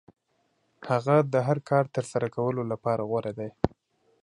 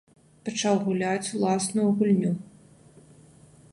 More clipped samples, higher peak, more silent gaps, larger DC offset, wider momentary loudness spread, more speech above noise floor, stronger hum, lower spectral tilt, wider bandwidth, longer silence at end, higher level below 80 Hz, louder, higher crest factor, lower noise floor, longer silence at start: neither; first, -6 dBFS vs -10 dBFS; neither; neither; about the same, 9 LU vs 10 LU; first, 46 dB vs 29 dB; neither; first, -7.5 dB/octave vs -5.5 dB/octave; about the same, 11 kHz vs 11.5 kHz; second, 0.55 s vs 1.3 s; first, -54 dBFS vs -66 dBFS; about the same, -27 LUFS vs -25 LUFS; first, 22 dB vs 16 dB; first, -72 dBFS vs -53 dBFS; first, 0.8 s vs 0.45 s